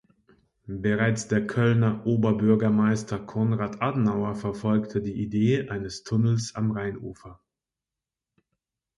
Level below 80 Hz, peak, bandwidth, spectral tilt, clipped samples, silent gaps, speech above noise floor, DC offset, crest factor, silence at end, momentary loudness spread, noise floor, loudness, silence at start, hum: -56 dBFS; -8 dBFS; 11 kHz; -7 dB/octave; under 0.1%; none; 65 dB; under 0.1%; 18 dB; 1.65 s; 10 LU; -89 dBFS; -25 LUFS; 0.65 s; none